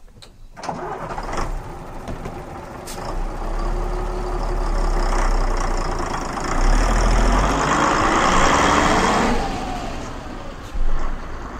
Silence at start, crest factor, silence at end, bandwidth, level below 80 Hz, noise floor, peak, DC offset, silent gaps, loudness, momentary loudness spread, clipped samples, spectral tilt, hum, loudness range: 0 s; 18 dB; 0 s; 10.5 kHz; -24 dBFS; -41 dBFS; -2 dBFS; under 0.1%; none; -21 LUFS; 17 LU; under 0.1%; -4.5 dB/octave; none; 12 LU